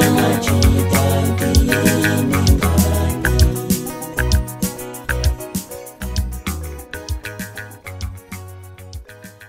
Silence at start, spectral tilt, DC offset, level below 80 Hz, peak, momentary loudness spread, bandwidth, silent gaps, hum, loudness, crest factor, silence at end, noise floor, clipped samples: 0 s; -5 dB/octave; under 0.1%; -24 dBFS; -2 dBFS; 19 LU; 16.5 kHz; none; none; -18 LUFS; 16 dB; 0 s; -38 dBFS; under 0.1%